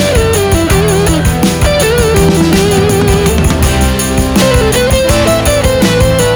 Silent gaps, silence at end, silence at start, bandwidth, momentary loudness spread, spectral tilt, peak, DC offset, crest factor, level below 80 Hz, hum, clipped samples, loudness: none; 0 s; 0 s; over 20 kHz; 2 LU; -5 dB/octave; 0 dBFS; 0.2%; 8 dB; -18 dBFS; none; under 0.1%; -9 LUFS